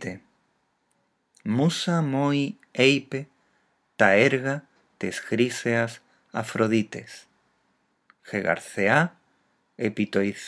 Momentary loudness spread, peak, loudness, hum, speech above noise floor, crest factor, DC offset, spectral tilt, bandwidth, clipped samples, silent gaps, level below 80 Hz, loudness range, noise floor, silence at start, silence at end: 17 LU; -2 dBFS; -24 LUFS; none; 47 dB; 24 dB; under 0.1%; -5.5 dB/octave; 11 kHz; under 0.1%; none; -76 dBFS; 5 LU; -71 dBFS; 0 s; 0 s